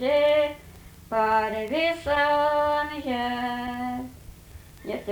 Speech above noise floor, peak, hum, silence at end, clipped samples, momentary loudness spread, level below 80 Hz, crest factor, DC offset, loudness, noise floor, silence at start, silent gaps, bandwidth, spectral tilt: 22 dB; -12 dBFS; none; 0 s; under 0.1%; 14 LU; -50 dBFS; 14 dB; under 0.1%; -25 LUFS; -47 dBFS; 0 s; none; over 20 kHz; -5 dB/octave